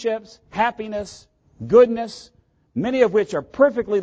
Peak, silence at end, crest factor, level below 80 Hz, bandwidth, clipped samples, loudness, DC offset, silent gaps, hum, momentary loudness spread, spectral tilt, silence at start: -4 dBFS; 0 s; 18 dB; -54 dBFS; 8.8 kHz; under 0.1%; -20 LUFS; under 0.1%; none; none; 18 LU; -6 dB/octave; 0 s